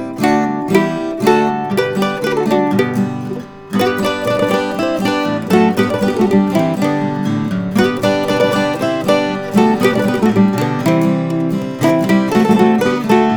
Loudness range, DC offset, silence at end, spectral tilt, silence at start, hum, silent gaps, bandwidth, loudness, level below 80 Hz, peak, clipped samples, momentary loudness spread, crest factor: 3 LU; under 0.1%; 0 s; -6.5 dB/octave; 0 s; none; none; over 20 kHz; -15 LUFS; -50 dBFS; 0 dBFS; under 0.1%; 5 LU; 14 dB